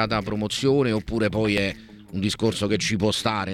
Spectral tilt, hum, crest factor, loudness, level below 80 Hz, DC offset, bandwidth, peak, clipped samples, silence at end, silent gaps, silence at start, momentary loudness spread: -5 dB/octave; none; 16 dB; -23 LUFS; -46 dBFS; under 0.1%; 15.5 kHz; -8 dBFS; under 0.1%; 0 s; none; 0 s; 7 LU